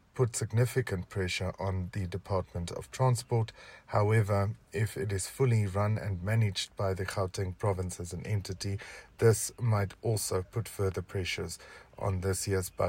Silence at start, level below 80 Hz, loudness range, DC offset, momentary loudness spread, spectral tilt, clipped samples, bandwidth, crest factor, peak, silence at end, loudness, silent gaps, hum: 0.15 s; -56 dBFS; 3 LU; under 0.1%; 10 LU; -5.5 dB/octave; under 0.1%; 16 kHz; 18 dB; -12 dBFS; 0 s; -32 LUFS; none; none